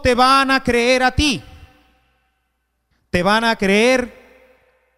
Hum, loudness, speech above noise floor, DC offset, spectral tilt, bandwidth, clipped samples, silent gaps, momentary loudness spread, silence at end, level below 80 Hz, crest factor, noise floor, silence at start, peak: none; -15 LUFS; 55 dB; under 0.1%; -4 dB/octave; 15.5 kHz; under 0.1%; none; 9 LU; 0.85 s; -36 dBFS; 16 dB; -70 dBFS; 0 s; -2 dBFS